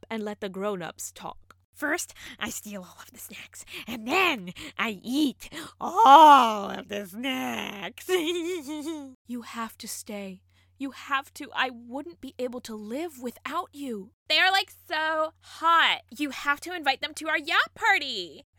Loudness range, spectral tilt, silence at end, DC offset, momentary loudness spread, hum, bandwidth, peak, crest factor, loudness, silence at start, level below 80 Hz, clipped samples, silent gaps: 13 LU; -2.5 dB/octave; 0.15 s; under 0.1%; 19 LU; none; 19 kHz; -2 dBFS; 24 dB; -25 LUFS; 0.1 s; -66 dBFS; under 0.1%; 1.64-1.73 s, 9.15-9.25 s, 14.13-14.26 s